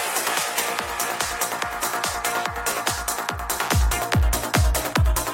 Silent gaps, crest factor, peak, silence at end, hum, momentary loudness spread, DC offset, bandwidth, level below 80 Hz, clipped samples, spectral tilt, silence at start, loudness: none; 18 dB; -6 dBFS; 0 s; none; 4 LU; under 0.1%; 16.5 kHz; -28 dBFS; under 0.1%; -3 dB/octave; 0 s; -23 LUFS